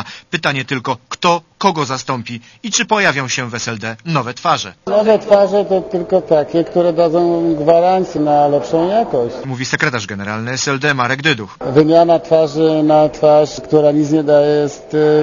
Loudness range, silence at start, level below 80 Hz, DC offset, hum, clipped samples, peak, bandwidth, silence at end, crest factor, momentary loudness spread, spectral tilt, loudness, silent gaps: 4 LU; 0 s; -52 dBFS; under 0.1%; none; under 0.1%; 0 dBFS; 7.4 kHz; 0 s; 14 dB; 9 LU; -5 dB/octave; -14 LUFS; none